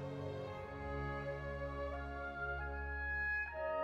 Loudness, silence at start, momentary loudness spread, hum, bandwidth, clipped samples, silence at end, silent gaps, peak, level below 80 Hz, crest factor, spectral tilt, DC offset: -42 LUFS; 0 s; 7 LU; none; 8 kHz; under 0.1%; 0 s; none; -28 dBFS; -50 dBFS; 14 dB; -7.5 dB/octave; under 0.1%